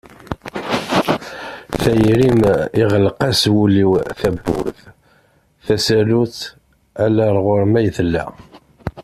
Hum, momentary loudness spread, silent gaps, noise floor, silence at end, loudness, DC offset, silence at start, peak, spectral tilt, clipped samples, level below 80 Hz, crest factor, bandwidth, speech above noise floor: none; 17 LU; none; -55 dBFS; 0 s; -16 LUFS; under 0.1%; 0.3 s; -2 dBFS; -6 dB/octave; under 0.1%; -40 dBFS; 16 dB; 14.5 kHz; 40 dB